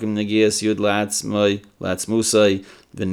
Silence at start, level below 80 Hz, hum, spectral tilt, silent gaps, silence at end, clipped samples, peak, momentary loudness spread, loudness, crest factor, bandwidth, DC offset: 0 s; -60 dBFS; none; -4 dB/octave; none; 0 s; under 0.1%; -4 dBFS; 10 LU; -20 LUFS; 16 dB; 18 kHz; under 0.1%